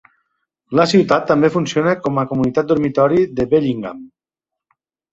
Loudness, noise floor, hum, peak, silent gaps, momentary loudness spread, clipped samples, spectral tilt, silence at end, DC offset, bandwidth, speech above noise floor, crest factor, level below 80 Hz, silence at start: -16 LUFS; -85 dBFS; none; -2 dBFS; none; 7 LU; under 0.1%; -6.5 dB/octave; 1.05 s; under 0.1%; 8 kHz; 69 dB; 16 dB; -50 dBFS; 0.7 s